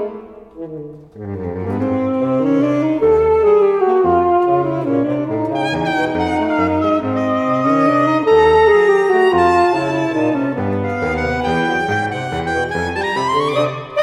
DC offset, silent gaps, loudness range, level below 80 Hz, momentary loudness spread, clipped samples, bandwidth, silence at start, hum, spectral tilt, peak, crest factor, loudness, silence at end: under 0.1%; none; 5 LU; -42 dBFS; 10 LU; under 0.1%; 11 kHz; 0 s; none; -7 dB/octave; -2 dBFS; 14 dB; -16 LUFS; 0 s